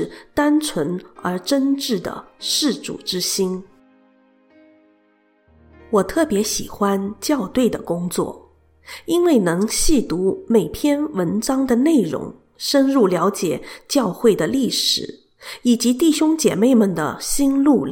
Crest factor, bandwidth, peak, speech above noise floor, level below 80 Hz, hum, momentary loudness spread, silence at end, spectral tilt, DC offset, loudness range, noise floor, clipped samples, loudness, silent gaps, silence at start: 16 dB; 17.5 kHz; -2 dBFS; 41 dB; -40 dBFS; none; 10 LU; 0 s; -4 dB/octave; under 0.1%; 7 LU; -59 dBFS; under 0.1%; -19 LUFS; none; 0 s